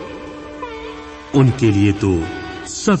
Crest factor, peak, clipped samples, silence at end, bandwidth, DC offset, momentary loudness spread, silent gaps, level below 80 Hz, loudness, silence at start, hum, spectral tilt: 16 dB; -2 dBFS; under 0.1%; 0 s; 8.8 kHz; under 0.1%; 17 LU; none; -42 dBFS; -17 LUFS; 0 s; none; -6.5 dB/octave